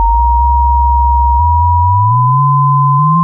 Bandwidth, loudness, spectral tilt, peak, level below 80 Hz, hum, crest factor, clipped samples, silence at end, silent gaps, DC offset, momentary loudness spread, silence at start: 1.2 kHz; -10 LUFS; -17 dB/octave; -2 dBFS; -16 dBFS; none; 6 dB; under 0.1%; 0 s; none; 0.3%; 1 LU; 0 s